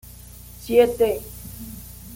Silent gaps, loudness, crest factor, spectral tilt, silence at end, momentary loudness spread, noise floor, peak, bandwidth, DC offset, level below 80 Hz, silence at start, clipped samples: none; -20 LUFS; 20 dB; -5 dB/octave; 0 s; 23 LU; -42 dBFS; -4 dBFS; 17 kHz; under 0.1%; -44 dBFS; 0.6 s; under 0.1%